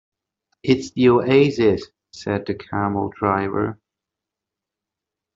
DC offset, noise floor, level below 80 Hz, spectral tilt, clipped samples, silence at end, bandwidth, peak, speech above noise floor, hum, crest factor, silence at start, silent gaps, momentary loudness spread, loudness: under 0.1%; -86 dBFS; -56 dBFS; -7 dB/octave; under 0.1%; 1.6 s; 7.8 kHz; -4 dBFS; 67 dB; none; 18 dB; 0.65 s; none; 12 LU; -20 LUFS